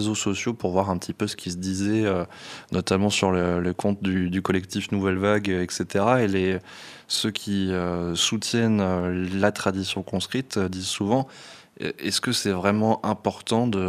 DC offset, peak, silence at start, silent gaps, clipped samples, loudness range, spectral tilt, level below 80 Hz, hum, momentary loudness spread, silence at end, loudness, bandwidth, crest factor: under 0.1%; -4 dBFS; 0 s; none; under 0.1%; 2 LU; -4.5 dB/octave; -56 dBFS; none; 7 LU; 0 s; -24 LUFS; 15 kHz; 20 dB